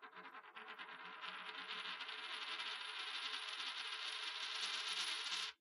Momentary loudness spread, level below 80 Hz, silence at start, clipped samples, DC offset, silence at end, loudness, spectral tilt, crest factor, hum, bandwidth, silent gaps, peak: 12 LU; under -90 dBFS; 0 s; under 0.1%; under 0.1%; 0.05 s; -44 LUFS; 1.5 dB/octave; 20 dB; none; 15.5 kHz; none; -26 dBFS